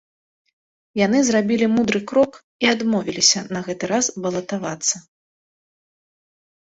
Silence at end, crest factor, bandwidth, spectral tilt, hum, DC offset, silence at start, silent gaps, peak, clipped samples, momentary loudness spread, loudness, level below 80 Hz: 1.65 s; 20 dB; 8.2 kHz; -3 dB/octave; none; under 0.1%; 0.95 s; 2.44-2.59 s; -2 dBFS; under 0.1%; 10 LU; -20 LUFS; -60 dBFS